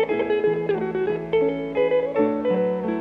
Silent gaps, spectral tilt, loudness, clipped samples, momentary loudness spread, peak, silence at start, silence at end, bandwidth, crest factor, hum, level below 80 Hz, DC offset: none; -8.5 dB/octave; -23 LUFS; under 0.1%; 3 LU; -8 dBFS; 0 s; 0 s; 4.9 kHz; 14 dB; none; -56 dBFS; under 0.1%